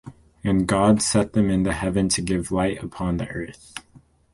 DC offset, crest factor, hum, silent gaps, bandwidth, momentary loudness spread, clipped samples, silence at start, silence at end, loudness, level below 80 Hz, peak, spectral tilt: under 0.1%; 18 dB; none; none; 11.5 kHz; 16 LU; under 0.1%; 0.05 s; 0.55 s; -22 LUFS; -42 dBFS; -4 dBFS; -5 dB/octave